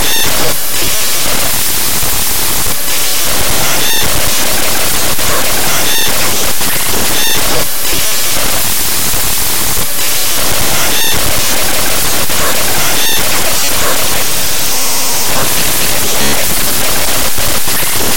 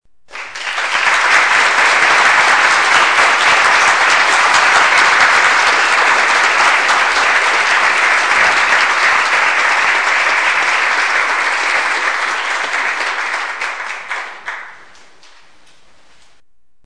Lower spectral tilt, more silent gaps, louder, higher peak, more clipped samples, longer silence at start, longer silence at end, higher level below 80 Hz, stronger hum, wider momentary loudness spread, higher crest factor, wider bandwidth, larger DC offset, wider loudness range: first, -1 dB/octave vs 0.5 dB/octave; neither; about the same, -10 LUFS vs -11 LUFS; about the same, 0 dBFS vs 0 dBFS; neither; second, 0 s vs 0.35 s; second, 0 s vs 2.1 s; first, -28 dBFS vs -54 dBFS; neither; second, 2 LU vs 11 LU; about the same, 16 dB vs 14 dB; first, over 20 kHz vs 10.5 kHz; first, 40% vs 0.9%; second, 0 LU vs 11 LU